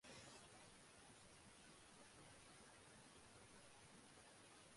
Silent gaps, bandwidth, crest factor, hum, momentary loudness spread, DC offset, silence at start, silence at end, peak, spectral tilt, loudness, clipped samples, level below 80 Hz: none; 11.5 kHz; 16 dB; none; 3 LU; under 0.1%; 0 s; 0 s; -50 dBFS; -2.5 dB/octave; -64 LUFS; under 0.1%; -82 dBFS